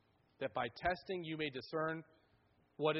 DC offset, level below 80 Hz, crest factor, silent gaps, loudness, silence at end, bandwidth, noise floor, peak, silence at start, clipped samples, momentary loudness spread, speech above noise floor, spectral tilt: under 0.1%; -68 dBFS; 22 dB; none; -41 LUFS; 0 s; 5.8 kHz; -74 dBFS; -20 dBFS; 0.4 s; under 0.1%; 5 LU; 33 dB; -3.5 dB/octave